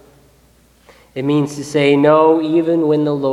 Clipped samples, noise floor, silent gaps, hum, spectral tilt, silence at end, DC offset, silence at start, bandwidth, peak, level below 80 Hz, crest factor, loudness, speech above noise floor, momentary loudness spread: under 0.1%; -51 dBFS; none; none; -6.5 dB/octave; 0 s; under 0.1%; 1.15 s; 12 kHz; 0 dBFS; -56 dBFS; 16 dB; -14 LUFS; 38 dB; 9 LU